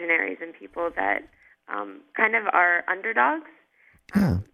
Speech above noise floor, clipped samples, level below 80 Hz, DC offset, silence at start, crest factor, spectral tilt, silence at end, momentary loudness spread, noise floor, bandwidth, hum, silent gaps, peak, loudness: 36 dB; under 0.1%; -46 dBFS; under 0.1%; 0 s; 22 dB; -7.5 dB/octave; 0.1 s; 14 LU; -60 dBFS; 15 kHz; none; none; -4 dBFS; -24 LUFS